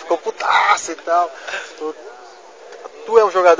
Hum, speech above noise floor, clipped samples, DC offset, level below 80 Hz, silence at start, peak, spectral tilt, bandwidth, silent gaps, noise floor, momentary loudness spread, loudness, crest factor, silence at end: none; 24 dB; under 0.1%; 0.2%; -64 dBFS; 0 s; 0 dBFS; -1.5 dB/octave; 8 kHz; none; -40 dBFS; 22 LU; -17 LUFS; 18 dB; 0 s